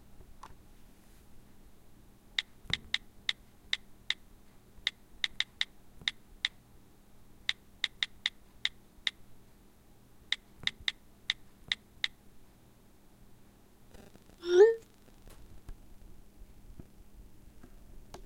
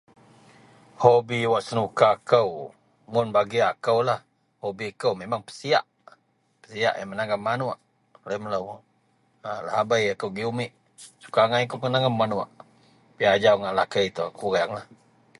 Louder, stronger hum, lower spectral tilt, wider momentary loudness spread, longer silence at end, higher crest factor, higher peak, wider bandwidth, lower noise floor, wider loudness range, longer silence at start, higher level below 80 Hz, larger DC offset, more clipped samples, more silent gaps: second, -34 LUFS vs -24 LUFS; neither; second, -3 dB/octave vs -5 dB/octave; first, 21 LU vs 15 LU; second, 0 s vs 0.55 s; about the same, 28 dB vs 24 dB; second, -10 dBFS vs -2 dBFS; first, 16 kHz vs 11.5 kHz; second, -59 dBFS vs -66 dBFS; about the same, 7 LU vs 6 LU; second, 0.5 s vs 1 s; first, -58 dBFS vs -64 dBFS; neither; neither; neither